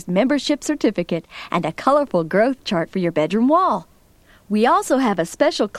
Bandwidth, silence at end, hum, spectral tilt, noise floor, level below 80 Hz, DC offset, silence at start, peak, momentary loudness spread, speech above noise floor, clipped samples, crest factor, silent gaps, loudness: 14.5 kHz; 0 s; none; -5.5 dB/octave; -52 dBFS; -54 dBFS; under 0.1%; 0.05 s; -2 dBFS; 8 LU; 33 dB; under 0.1%; 16 dB; none; -19 LUFS